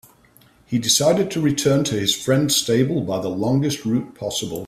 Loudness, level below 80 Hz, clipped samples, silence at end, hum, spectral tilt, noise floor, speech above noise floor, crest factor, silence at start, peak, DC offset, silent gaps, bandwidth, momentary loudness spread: -20 LUFS; -54 dBFS; under 0.1%; 0 s; none; -4.5 dB/octave; -53 dBFS; 34 dB; 16 dB; 0.7 s; -4 dBFS; under 0.1%; none; 16 kHz; 8 LU